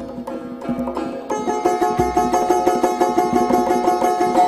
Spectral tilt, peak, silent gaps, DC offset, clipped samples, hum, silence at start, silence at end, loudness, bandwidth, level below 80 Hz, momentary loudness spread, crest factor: -5 dB/octave; -2 dBFS; none; under 0.1%; under 0.1%; none; 0 s; 0 s; -19 LUFS; 15 kHz; -44 dBFS; 10 LU; 18 dB